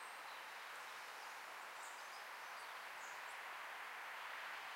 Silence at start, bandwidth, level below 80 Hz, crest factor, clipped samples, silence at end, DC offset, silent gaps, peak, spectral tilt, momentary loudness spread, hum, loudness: 0 s; 16 kHz; under -90 dBFS; 14 dB; under 0.1%; 0 s; under 0.1%; none; -36 dBFS; 1 dB/octave; 3 LU; none; -50 LUFS